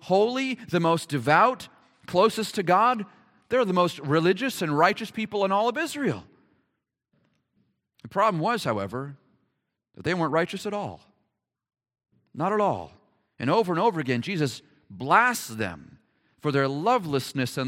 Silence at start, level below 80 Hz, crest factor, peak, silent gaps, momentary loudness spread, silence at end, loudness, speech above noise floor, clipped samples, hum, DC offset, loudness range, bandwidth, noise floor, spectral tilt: 0.05 s; -68 dBFS; 22 dB; -4 dBFS; none; 13 LU; 0 s; -25 LUFS; 55 dB; under 0.1%; none; under 0.1%; 7 LU; 16.5 kHz; -79 dBFS; -5.5 dB/octave